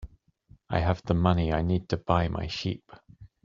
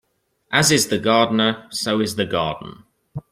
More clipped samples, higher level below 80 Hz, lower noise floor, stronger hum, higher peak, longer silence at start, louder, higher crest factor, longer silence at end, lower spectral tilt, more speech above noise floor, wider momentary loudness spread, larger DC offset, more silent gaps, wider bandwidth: neither; first, -44 dBFS vs -54 dBFS; about the same, -59 dBFS vs -61 dBFS; neither; second, -6 dBFS vs -2 dBFS; second, 0 s vs 0.5 s; second, -28 LUFS vs -19 LUFS; about the same, 22 dB vs 18 dB; about the same, 0.2 s vs 0.1 s; first, -6 dB/octave vs -3.5 dB/octave; second, 32 dB vs 42 dB; second, 8 LU vs 19 LU; neither; neither; second, 7.4 kHz vs 16 kHz